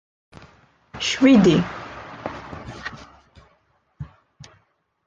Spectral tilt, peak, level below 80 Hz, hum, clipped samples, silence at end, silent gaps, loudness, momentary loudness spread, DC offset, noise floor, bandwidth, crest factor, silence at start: -5.5 dB/octave; -4 dBFS; -50 dBFS; none; under 0.1%; 1 s; none; -18 LUFS; 26 LU; under 0.1%; -65 dBFS; 7.8 kHz; 20 dB; 0.95 s